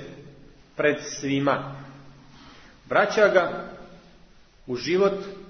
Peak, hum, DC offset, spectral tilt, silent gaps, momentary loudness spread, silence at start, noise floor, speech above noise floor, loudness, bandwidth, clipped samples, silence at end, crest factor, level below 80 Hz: -6 dBFS; none; under 0.1%; -5 dB/octave; none; 23 LU; 0 s; -52 dBFS; 29 dB; -24 LUFS; 6.6 kHz; under 0.1%; 0 s; 22 dB; -56 dBFS